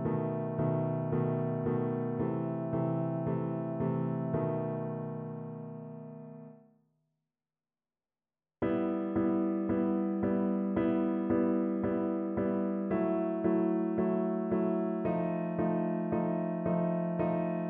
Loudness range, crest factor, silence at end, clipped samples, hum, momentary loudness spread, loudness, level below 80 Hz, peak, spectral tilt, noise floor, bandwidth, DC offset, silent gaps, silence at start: 9 LU; 14 dB; 0 s; under 0.1%; none; 7 LU; -32 LUFS; -64 dBFS; -18 dBFS; -10 dB/octave; under -90 dBFS; 3.6 kHz; under 0.1%; none; 0 s